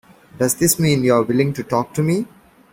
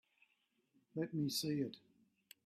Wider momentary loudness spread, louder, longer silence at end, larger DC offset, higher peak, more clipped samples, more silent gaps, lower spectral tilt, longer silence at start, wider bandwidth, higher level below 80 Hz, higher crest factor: second, 7 LU vs 11 LU; first, -18 LUFS vs -41 LUFS; second, 0.5 s vs 0.65 s; neither; first, -2 dBFS vs -28 dBFS; neither; neither; about the same, -5 dB/octave vs -5 dB/octave; second, 0.35 s vs 0.95 s; about the same, 16.5 kHz vs 15.5 kHz; first, -52 dBFS vs -84 dBFS; about the same, 16 dB vs 18 dB